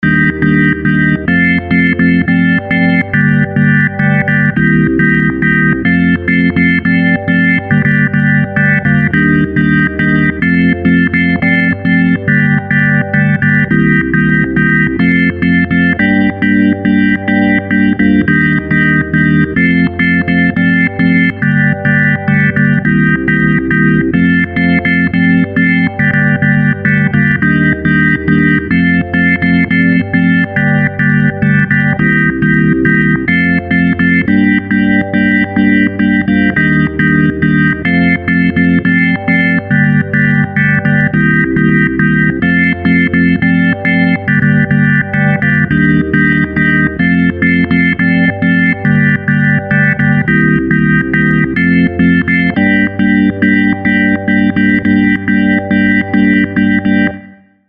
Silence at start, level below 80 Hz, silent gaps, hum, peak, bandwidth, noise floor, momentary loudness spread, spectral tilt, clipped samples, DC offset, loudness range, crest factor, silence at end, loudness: 0 s; -34 dBFS; none; none; 0 dBFS; 5 kHz; -36 dBFS; 1 LU; -9.5 dB/octave; under 0.1%; under 0.1%; 0 LU; 10 dB; 0.4 s; -10 LUFS